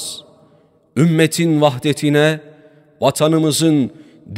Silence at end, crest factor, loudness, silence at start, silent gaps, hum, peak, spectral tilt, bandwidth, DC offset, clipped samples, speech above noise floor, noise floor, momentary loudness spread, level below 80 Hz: 0 s; 16 dB; -15 LUFS; 0 s; none; none; 0 dBFS; -5.5 dB/octave; 16 kHz; under 0.1%; under 0.1%; 39 dB; -53 dBFS; 12 LU; -62 dBFS